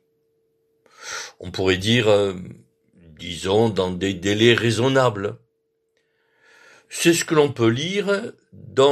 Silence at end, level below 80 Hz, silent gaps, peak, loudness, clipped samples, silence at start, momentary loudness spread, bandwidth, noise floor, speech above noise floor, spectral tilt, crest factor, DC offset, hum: 0 s; -56 dBFS; none; -2 dBFS; -20 LUFS; under 0.1%; 1 s; 16 LU; 14 kHz; -71 dBFS; 52 dB; -4.5 dB/octave; 20 dB; under 0.1%; none